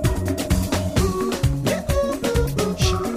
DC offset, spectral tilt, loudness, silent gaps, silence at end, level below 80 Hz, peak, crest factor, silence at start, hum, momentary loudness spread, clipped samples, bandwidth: under 0.1%; -5.5 dB/octave; -22 LUFS; none; 0 s; -28 dBFS; -8 dBFS; 14 dB; 0 s; none; 2 LU; under 0.1%; 16 kHz